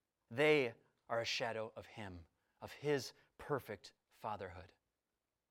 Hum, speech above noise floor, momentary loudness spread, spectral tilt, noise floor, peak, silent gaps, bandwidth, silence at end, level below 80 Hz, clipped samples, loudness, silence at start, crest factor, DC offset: none; over 50 dB; 22 LU; -4.5 dB/octave; under -90 dBFS; -20 dBFS; none; 16.5 kHz; 0.85 s; -76 dBFS; under 0.1%; -40 LUFS; 0.3 s; 22 dB; under 0.1%